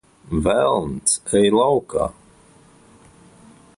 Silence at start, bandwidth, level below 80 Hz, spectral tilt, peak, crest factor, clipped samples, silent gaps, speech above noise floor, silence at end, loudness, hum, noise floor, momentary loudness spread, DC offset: 0.3 s; 11.5 kHz; -42 dBFS; -4 dB/octave; -4 dBFS; 16 dB; under 0.1%; none; 32 dB; 1.65 s; -19 LUFS; none; -51 dBFS; 9 LU; under 0.1%